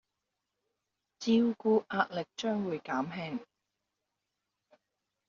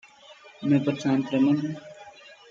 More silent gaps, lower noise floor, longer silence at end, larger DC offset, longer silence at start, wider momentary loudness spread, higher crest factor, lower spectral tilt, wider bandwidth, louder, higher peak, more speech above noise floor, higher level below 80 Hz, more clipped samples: neither; first, -86 dBFS vs -51 dBFS; first, 1.85 s vs 0.15 s; neither; first, 1.2 s vs 0.3 s; second, 11 LU vs 23 LU; first, 22 dB vs 16 dB; second, -4.5 dB/octave vs -7.5 dB/octave; about the same, 7.4 kHz vs 7.6 kHz; second, -32 LUFS vs -25 LUFS; second, -14 dBFS vs -10 dBFS; first, 55 dB vs 27 dB; second, -76 dBFS vs -70 dBFS; neither